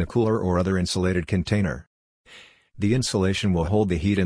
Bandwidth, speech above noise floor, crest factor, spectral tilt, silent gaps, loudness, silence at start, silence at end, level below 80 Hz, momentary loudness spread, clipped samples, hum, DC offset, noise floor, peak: 10.5 kHz; 28 dB; 16 dB; -6 dB/octave; 1.87-2.24 s; -23 LUFS; 0 s; 0 s; -42 dBFS; 3 LU; under 0.1%; none; under 0.1%; -50 dBFS; -6 dBFS